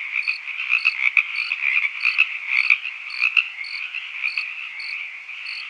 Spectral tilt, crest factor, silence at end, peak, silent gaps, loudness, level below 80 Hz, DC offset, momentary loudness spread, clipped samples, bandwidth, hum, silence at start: 4 dB/octave; 24 dB; 0 s; 0 dBFS; none; -20 LUFS; under -90 dBFS; under 0.1%; 11 LU; under 0.1%; 9.8 kHz; none; 0 s